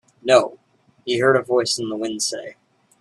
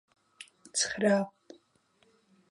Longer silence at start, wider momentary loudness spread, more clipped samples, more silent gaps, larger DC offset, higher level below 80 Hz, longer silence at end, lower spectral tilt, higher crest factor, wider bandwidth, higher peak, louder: second, 0.25 s vs 0.4 s; second, 16 LU vs 24 LU; neither; neither; neither; first, -66 dBFS vs -74 dBFS; second, 0.5 s vs 1.2 s; about the same, -3 dB/octave vs -3 dB/octave; about the same, 20 dB vs 20 dB; about the same, 12.5 kHz vs 11.5 kHz; first, 0 dBFS vs -14 dBFS; first, -20 LUFS vs -30 LUFS